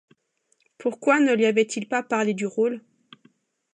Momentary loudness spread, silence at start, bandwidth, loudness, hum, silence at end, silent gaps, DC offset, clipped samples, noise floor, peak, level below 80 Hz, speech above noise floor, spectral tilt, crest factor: 10 LU; 0.8 s; 10 kHz; -23 LUFS; none; 0.95 s; none; under 0.1%; under 0.1%; -69 dBFS; -8 dBFS; -80 dBFS; 47 dB; -4.5 dB/octave; 18 dB